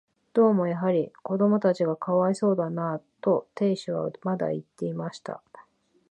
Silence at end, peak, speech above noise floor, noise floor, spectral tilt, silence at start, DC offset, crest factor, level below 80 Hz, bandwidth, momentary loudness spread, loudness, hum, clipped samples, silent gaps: 0.5 s; -10 dBFS; 33 dB; -58 dBFS; -8 dB/octave; 0.35 s; under 0.1%; 16 dB; -76 dBFS; 9 kHz; 11 LU; -26 LUFS; none; under 0.1%; none